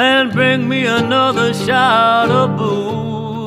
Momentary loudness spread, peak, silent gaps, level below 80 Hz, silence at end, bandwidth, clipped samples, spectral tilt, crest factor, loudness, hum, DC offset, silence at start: 8 LU; -2 dBFS; none; -52 dBFS; 0 s; 15 kHz; under 0.1%; -5.5 dB/octave; 12 dB; -14 LUFS; none; under 0.1%; 0 s